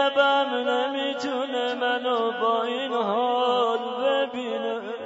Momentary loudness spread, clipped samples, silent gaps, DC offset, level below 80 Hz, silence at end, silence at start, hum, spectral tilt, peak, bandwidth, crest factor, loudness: 7 LU; under 0.1%; none; under 0.1%; -80 dBFS; 0 s; 0 s; none; -3.5 dB/octave; -8 dBFS; 7.8 kHz; 16 dB; -24 LUFS